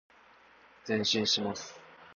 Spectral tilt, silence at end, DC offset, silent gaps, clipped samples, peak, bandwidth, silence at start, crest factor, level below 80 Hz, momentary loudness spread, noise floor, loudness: -3 dB/octave; 0 s; under 0.1%; none; under 0.1%; -16 dBFS; 7.4 kHz; 0.85 s; 18 dB; -70 dBFS; 21 LU; -60 dBFS; -30 LUFS